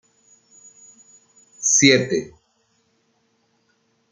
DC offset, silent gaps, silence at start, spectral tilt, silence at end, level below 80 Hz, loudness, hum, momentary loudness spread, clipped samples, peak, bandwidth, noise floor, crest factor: under 0.1%; none; 1.6 s; -2.5 dB/octave; 1.85 s; -64 dBFS; -16 LUFS; none; 15 LU; under 0.1%; -2 dBFS; 10.5 kHz; -66 dBFS; 24 dB